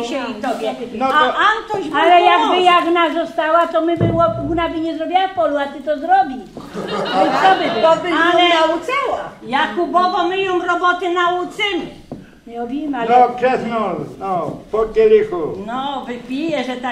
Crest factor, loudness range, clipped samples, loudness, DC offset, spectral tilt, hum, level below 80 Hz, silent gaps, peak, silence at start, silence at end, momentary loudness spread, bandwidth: 16 dB; 5 LU; under 0.1%; -16 LUFS; under 0.1%; -5 dB/octave; none; -46 dBFS; none; -2 dBFS; 0 s; 0 s; 12 LU; 12.5 kHz